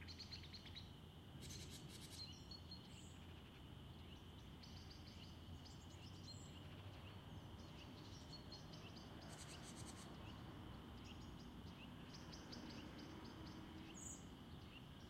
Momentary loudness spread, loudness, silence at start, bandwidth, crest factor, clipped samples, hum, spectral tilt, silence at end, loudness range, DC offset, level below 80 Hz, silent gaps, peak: 5 LU; -57 LUFS; 0 s; 16 kHz; 16 dB; under 0.1%; none; -4.5 dB/octave; 0 s; 2 LU; under 0.1%; -66 dBFS; none; -42 dBFS